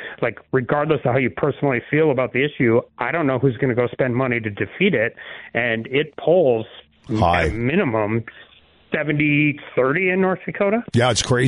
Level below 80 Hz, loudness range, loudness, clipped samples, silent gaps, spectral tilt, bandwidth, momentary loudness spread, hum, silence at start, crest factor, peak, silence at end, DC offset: -44 dBFS; 1 LU; -20 LUFS; under 0.1%; none; -6 dB/octave; 10.5 kHz; 7 LU; none; 0 s; 14 dB; -6 dBFS; 0 s; under 0.1%